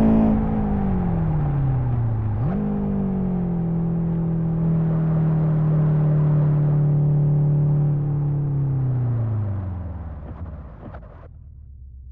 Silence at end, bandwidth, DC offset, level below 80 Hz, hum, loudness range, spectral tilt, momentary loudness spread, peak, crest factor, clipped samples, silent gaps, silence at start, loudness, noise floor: 0 s; 2.9 kHz; under 0.1%; -34 dBFS; none; 7 LU; -13.5 dB/octave; 14 LU; -6 dBFS; 14 dB; under 0.1%; none; 0 s; -21 LUFS; -41 dBFS